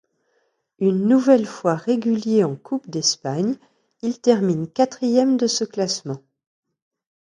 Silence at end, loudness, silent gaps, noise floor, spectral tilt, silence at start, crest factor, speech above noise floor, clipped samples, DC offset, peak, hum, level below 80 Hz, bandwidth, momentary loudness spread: 1.15 s; -20 LUFS; none; -68 dBFS; -5 dB/octave; 0.8 s; 20 dB; 49 dB; under 0.1%; under 0.1%; -2 dBFS; none; -70 dBFS; 11 kHz; 10 LU